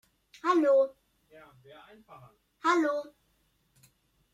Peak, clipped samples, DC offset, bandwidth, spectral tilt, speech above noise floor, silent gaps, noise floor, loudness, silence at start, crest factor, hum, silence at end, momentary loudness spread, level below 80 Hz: -14 dBFS; under 0.1%; under 0.1%; 12 kHz; -4 dB/octave; 44 dB; none; -72 dBFS; -28 LUFS; 0.45 s; 18 dB; none; 1.3 s; 12 LU; -76 dBFS